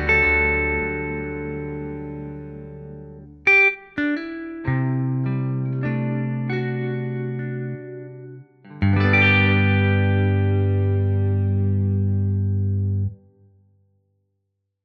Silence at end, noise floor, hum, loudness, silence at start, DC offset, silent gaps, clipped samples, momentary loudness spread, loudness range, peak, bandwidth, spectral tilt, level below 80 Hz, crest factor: 1.7 s; -76 dBFS; none; -21 LUFS; 0 s; under 0.1%; none; under 0.1%; 19 LU; 7 LU; -6 dBFS; 6.2 kHz; -8.5 dB/octave; -42 dBFS; 16 dB